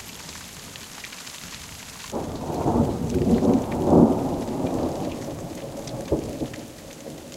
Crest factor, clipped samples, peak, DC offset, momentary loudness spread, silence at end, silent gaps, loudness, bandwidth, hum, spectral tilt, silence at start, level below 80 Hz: 22 dB; under 0.1%; -2 dBFS; under 0.1%; 18 LU; 0 s; none; -24 LUFS; 16.5 kHz; none; -6.5 dB/octave; 0 s; -42 dBFS